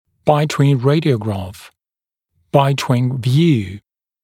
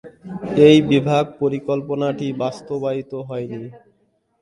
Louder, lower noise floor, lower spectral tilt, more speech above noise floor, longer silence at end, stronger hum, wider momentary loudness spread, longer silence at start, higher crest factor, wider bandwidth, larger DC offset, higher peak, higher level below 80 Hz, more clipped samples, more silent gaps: first, -16 LUFS vs -19 LUFS; first, under -90 dBFS vs -64 dBFS; about the same, -7 dB/octave vs -7 dB/octave; first, over 75 dB vs 46 dB; second, 0.45 s vs 0.65 s; neither; second, 12 LU vs 19 LU; first, 0.25 s vs 0.05 s; about the same, 16 dB vs 20 dB; first, 15 kHz vs 11 kHz; neither; about the same, 0 dBFS vs 0 dBFS; about the same, -54 dBFS vs -56 dBFS; neither; neither